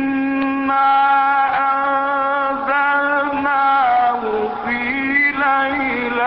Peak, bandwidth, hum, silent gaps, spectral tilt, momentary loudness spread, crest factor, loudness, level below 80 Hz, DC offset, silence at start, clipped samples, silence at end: -6 dBFS; 5.6 kHz; none; none; -9 dB/octave; 5 LU; 12 dB; -16 LUFS; -52 dBFS; 0.1%; 0 s; under 0.1%; 0 s